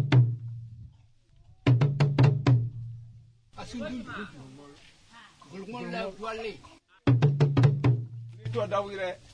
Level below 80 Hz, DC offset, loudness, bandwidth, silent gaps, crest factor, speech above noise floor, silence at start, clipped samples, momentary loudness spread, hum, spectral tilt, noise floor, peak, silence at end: -54 dBFS; under 0.1%; -27 LUFS; 7.8 kHz; none; 18 dB; 24 dB; 0 s; under 0.1%; 21 LU; none; -8 dB/octave; -59 dBFS; -8 dBFS; 0.2 s